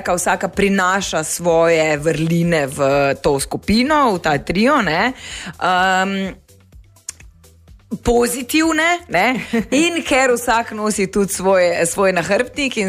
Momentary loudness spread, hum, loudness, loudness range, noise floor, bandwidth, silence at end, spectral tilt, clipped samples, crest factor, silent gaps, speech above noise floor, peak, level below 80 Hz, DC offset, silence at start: 6 LU; none; -16 LUFS; 4 LU; -45 dBFS; 15.5 kHz; 0 s; -4 dB/octave; under 0.1%; 14 dB; none; 29 dB; -4 dBFS; -40 dBFS; under 0.1%; 0 s